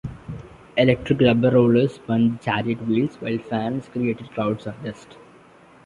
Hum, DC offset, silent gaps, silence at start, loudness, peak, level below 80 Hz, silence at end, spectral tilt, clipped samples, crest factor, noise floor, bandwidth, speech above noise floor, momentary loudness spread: none; under 0.1%; none; 0.05 s; -21 LUFS; -2 dBFS; -50 dBFS; 0.8 s; -8 dB/octave; under 0.1%; 20 dB; -50 dBFS; 7.4 kHz; 29 dB; 18 LU